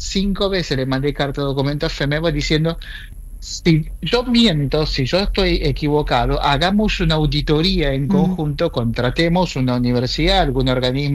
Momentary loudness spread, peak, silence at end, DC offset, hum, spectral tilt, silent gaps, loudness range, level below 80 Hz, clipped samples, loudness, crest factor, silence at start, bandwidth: 5 LU; -4 dBFS; 0 s; under 0.1%; none; -6 dB/octave; none; 3 LU; -28 dBFS; under 0.1%; -18 LUFS; 14 dB; 0 s; 13 kHz